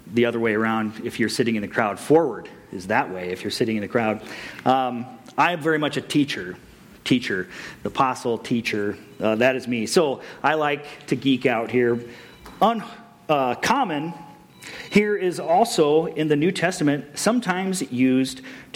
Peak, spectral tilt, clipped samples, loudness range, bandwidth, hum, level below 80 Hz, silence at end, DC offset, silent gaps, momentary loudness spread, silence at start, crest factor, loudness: -6 dBFS; -5 dB/octave; under 0.1%; 3 LU; 16.5 kHz; none; -60 dBFS; 0.1 s; under 0.1%; none; 14 LU; 0.05 s; 18 dB; -22 LUFS